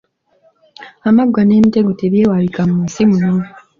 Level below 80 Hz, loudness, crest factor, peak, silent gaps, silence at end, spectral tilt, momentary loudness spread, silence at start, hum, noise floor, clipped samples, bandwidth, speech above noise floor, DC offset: -48 dBFS; -13 LUFS; 12 dB; -2 dBFS; none; 0.3 s; -8 dB/octave; 6 LU; 0.8 s; none; -55 dBFS; under 0.1%; 7.4 kHz; 43 dB; under 0.1%